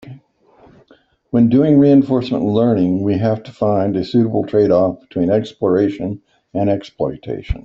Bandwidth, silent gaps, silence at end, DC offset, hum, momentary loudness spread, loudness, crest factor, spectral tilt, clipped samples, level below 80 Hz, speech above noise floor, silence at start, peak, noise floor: 7 kHz; none; 0.05 s; under 0.1%; none; 12 LU; -16 LUFS; 14 dB; -9.5 dB/octave; under 0.1%; -38 dBFS; 37 dB; 0.05 s; -2 dBFS; -53 dBFS